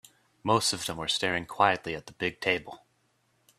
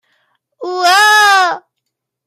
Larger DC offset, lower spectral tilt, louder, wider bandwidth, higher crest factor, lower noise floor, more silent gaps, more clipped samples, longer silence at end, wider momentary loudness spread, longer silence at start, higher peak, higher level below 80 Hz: neither; first, -3 dB/octave vs 1.5 dB/octave; second, -28 LUFS vs -9 LUFS; about the same, 15 kHz vs 16 kHz; first, 24 dB vs 14 dB; second, -71 dBFS vs -75 dBFS; neither; neither; first, 0.85 s vs 0.7 s; second, 10 LU vs 19 LU; second, 0.45 s vs 0.6 s; second, -6 dBFS vs 0 dBFS; first, -64 dBFS vs -78 dBFS